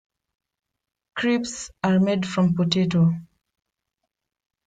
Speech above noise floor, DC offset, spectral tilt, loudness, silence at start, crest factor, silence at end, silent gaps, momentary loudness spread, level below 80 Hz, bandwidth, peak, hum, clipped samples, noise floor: 61 dB; under 0.1%; -6 dB/octave; -22 LUFS; 1.15 s; 18 dB; 1.45 s; none; 10 LU; -60 dBFS; 9.2 kHz; -6 dBFS; none; under 0.1%; -82 dBFS